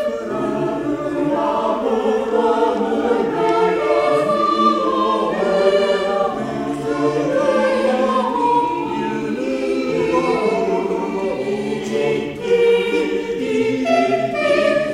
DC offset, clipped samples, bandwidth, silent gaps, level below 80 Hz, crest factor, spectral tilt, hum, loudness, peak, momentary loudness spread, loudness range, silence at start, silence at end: under 0.1%; under 0.1%; 12 kHz; none; -50 dBFS; 16 dB; -5.5 dB/octave; none; -18 LUFS; -2 dBFS; 6 LU; 3 LU; 0 s; 0 s